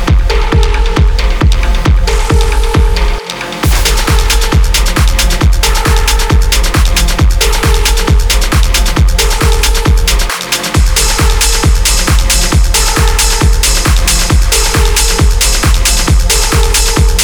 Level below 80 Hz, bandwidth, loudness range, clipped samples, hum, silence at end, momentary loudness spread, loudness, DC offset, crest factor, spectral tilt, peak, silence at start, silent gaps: -10 dBFS; over 20 kHz; 2 LU; under 0.1%; none; 0 s; 3 LU; -10 LUFS; 0.4%; 8 dB; -3 dB/octave; 0 dBFS; 0 s; none